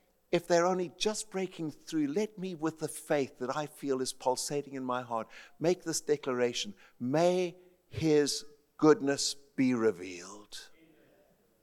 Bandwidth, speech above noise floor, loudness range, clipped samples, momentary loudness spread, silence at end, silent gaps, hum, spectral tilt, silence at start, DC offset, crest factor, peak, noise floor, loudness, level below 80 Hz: 16 kHz; 35 dB; 4 LU; under 0.1%; 13 LU; 0.95 s; none; none; -4.5 dB/octave; 0.3 s; under 0.1%; 20 dB; -12 dBFS; -67 dBFS; -32 LUFS; -68 dBFS